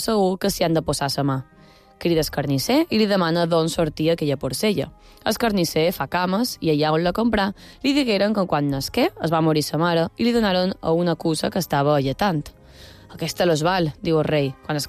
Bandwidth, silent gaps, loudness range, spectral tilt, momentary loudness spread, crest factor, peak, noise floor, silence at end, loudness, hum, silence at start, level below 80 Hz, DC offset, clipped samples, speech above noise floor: 15.5 kHz; none; 2 LU; -5.5 dB/octave; 5 LU; 12 dB; -8 dBFS; -45 dBFS; 0 s; -21 LUFS; none; 0 s; -46 dBFS; under 0.1%; under 0.1%; 24 dB